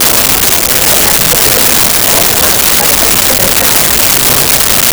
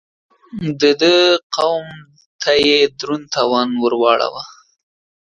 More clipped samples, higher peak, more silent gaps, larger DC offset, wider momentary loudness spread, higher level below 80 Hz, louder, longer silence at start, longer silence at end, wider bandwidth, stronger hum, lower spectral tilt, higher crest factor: neither; about the same, 0 dBFS vs 0 dBFS; second, none vs 1.43-1.50 s, 2.26-2.39 s; neither; second, 1 LU vs 14 LU; first, -28 dBFS vs -56 dBFS; first, -5 LUFS vs -15 LUFS; second, 0 s vs 0.55 s; second, 0 s vs 0.8 s; first, over 20 kHz vs 10.5 kHz; neither; second, -1 dB/octave vs -4 dB/octave; second, 8 dB vs 16 dB